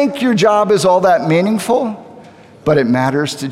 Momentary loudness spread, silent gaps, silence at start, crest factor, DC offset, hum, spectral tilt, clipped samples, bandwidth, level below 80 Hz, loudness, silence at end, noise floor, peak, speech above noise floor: 8 LU; none; 0 s; 12 dB; under 0.1%; none; -5.5 dB/octave; under 0.1%; 15.5 kHz; -54 dBFS; -14 LUFS; 0 s; -39 dBFS; 0 dBFS; 26 dB